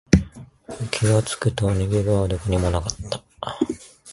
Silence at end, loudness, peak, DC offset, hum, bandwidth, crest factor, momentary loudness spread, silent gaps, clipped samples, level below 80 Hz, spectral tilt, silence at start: 0 s; -23 LUFS; 0 dBFS; under 0.1%; none; 11.5 kHz; 22 dB; 14 LU; none; under 0.1%; -34 dBFS; -6 dB/octave; 0.1 s